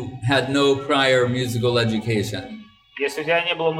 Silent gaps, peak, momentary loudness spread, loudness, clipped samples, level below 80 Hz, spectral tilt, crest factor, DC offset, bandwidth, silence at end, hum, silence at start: none; -6 dBFS; 13 LU; -20 LUFS; under 0.1%; -54 dBFS; -5 dB/octave; 16 dB; under 0.1%; 15.5 kHz; 0 s; none; 0 s